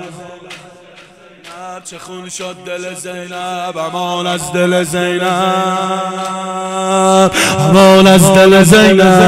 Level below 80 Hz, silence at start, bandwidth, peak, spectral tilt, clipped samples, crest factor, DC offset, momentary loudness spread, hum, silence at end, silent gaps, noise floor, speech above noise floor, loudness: -42 dBFS; 0 s; 16 kHz; 0 dBFS; -4.5 dB/octave; under 0.1%; 12 dB; under 0.1%; 23 LU; none; 0 s; none; -40 dBFS; 29 dB; -10 LUFS